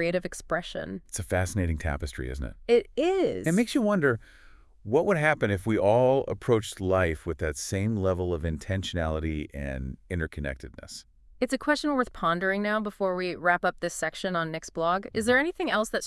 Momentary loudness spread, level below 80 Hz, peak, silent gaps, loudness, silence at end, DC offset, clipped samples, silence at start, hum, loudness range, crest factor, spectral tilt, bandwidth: 11 LU; -44 dBFS; -10 dBFS; none; -27 LUFS; 0 s; under 0.1%; under 0.1%; 0 s; none; 6 LU; 18 dB; -5.5 dB/octave; 12 kHz